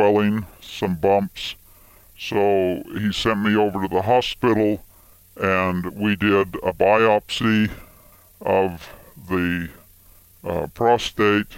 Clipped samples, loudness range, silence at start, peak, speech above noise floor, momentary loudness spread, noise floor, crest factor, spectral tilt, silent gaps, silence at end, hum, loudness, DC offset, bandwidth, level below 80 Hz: under 0.1%; 4 LU; 0 s; -2 dBFS; 30 dB; 12 LU; -51 dBFS; 18 dB; -6 dB/octave; none; 0 s; none; -21 LUFS; under 0.1%; 16.5 kHz; -48 dBFS